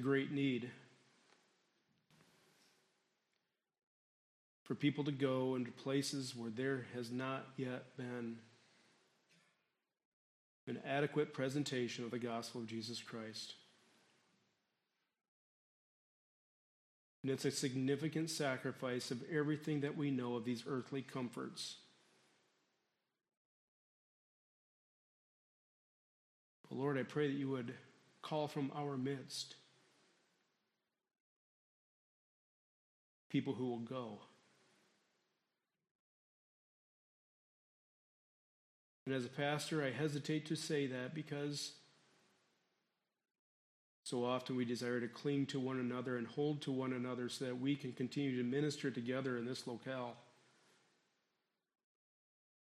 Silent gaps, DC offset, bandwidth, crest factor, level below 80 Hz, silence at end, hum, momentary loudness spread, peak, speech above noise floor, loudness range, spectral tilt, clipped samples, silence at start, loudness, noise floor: 3.83-4.66 s, 10.05-10.67 s, 15.28-17.24 s, 23.37-26.64 s, 31.20-33.30 s, 35.91-39.06 s, 43.39-44.03 s; under 0.1%; 13.5 kHz; 22 dB; -88 dBFS; 2.5 s; none; 9 LU; -24 dBFS; 49 dB; 11 LU; -5.5 dB/octave; under 0.1%; 0 s; -42 LUFS; -90 dBFS